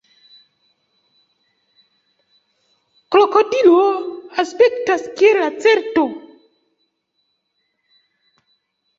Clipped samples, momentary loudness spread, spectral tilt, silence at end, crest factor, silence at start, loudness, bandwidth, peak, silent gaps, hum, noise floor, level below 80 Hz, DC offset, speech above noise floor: under 0.1%; 11 LU; -3.5 dB/octave; 2.8 s; 18 dB; 3.1 s; -15 LUFS; 7.8 kHz; 0 dBFS; none; none; -70 dBFS; -68 dBFS; under 0.1%; 56 dB